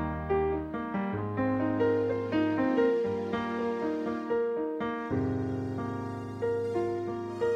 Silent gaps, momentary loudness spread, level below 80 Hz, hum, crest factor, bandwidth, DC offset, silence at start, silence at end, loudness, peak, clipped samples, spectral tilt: none; 7 LU; -52 dBFS; none; 14 dB; 8.2 kHz; under 0.1%; 0 s; 0 s; -31 LUFS; -16 dBFS; under 0.1%; -8.5 dB/octave